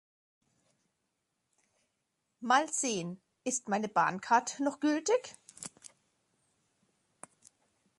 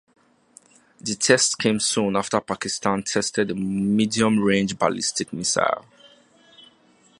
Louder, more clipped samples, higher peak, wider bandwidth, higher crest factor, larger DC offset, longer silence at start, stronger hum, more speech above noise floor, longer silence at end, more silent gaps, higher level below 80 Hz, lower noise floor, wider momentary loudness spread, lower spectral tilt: second, -31 LUFS vs -22 LUFS; neither; second, -12 dBFS vs -2 dBFS; about the same, 11.5 kHz vs 11.5 kHz; about the same, 22 dB vs 22 dB; neither; first, 2.4 s vs 1.05 s; neither; first, 52 dB vs 35 dB; first, 2.3 s vs 0.6 s; neither; second, -82 dBFS vs -58 dBFS; first, -83 dBFS vs -57 dBFS; first, 18 LU vs 7 LU; about the same, -3 dB/octave vs -3.5 dB/octave